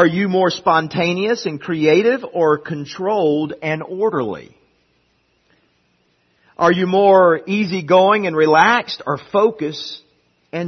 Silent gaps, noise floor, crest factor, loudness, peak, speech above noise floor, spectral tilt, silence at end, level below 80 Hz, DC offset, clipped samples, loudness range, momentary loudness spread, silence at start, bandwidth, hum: none; -62 dBFS; 18 dB; -16 LUFS; 0 dBFS; 46 dB; -6 dB/octave; 0 s; -62 dBFS; under 0.1%; under 0.1%; 8 LU; 12 LU; 0 s; 6.4 kHz; none